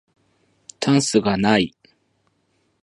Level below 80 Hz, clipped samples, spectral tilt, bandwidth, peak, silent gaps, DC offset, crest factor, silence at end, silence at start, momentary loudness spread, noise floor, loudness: -54 dBFS; under 0.1%; -4.5 dB/octave; 11.5 kHz; -2 dBFS; none; under 0.1%; 20 dB; 1.15 s; 0.8 s; 8 LU; -67 dBFS; -19 LUFS